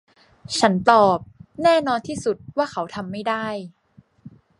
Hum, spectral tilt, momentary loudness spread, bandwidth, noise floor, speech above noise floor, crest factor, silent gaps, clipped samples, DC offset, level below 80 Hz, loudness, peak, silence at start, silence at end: none; -4.5 dB/octave; 14 LU; 11.5 kHz; -47 dBFS; 27 dB; 22 dB; none; under 0.1%; under 0.1%; -56 dBFS; -21 LUFS; 0 dBFS; 0.5 s; 0.3 s